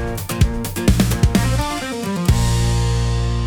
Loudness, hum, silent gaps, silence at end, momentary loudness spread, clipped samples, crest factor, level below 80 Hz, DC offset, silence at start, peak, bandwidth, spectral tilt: -19 LUFS; none; none; 0 s; 6 LU; under 0.1%; 14 dB; -22 dBFS; under 0.1%; 0 s; -4 dBFS; 20 kHz; -5.5 dB/octave